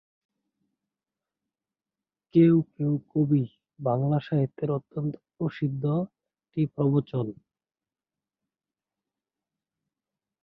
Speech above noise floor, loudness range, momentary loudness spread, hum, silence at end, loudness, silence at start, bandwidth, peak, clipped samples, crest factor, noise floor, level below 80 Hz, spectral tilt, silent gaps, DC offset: over 65 dB; 7 LU; 12 LU; none; 3.1 s; -27 LUFS; 2.35 s; 5 kHz; -8 dBFS; under 0.1%; 20 dB; under -90 dBFS; -68 dBFS; -12 dB/octave; none; under 0.1%